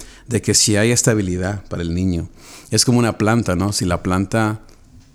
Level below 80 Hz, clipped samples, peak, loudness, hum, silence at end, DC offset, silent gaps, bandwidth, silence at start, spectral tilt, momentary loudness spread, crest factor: -40 dBFS; under 0.1%; 0 dBFS; -18 LUFS; none; 0.5 s; under 0.1%; none; 16 kHz; 0 s; -4 dB/octave; 10 LU; 18 dB